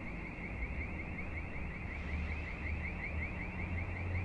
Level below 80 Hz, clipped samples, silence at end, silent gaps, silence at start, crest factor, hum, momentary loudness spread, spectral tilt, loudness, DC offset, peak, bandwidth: -46 dBFS; under 0.1%; 0 s; none; 0 s; 14 dB; none; 3 LU; -8 dB/octave; -41 LUFS; under 0.1%; -26 dBFS; 7.8 kHz